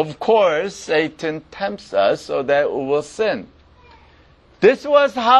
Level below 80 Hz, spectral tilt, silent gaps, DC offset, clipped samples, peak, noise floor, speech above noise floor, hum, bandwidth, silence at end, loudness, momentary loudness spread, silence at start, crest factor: -54 dBFS; -4.5 dB/octave; none; under 0.1%; under 0.1%; 0 dBFS; -51 dBFS; 33 dB; none; 10.5 kHz; 0 s; -19 LUFS; 11 LU; 0 s; 18 dB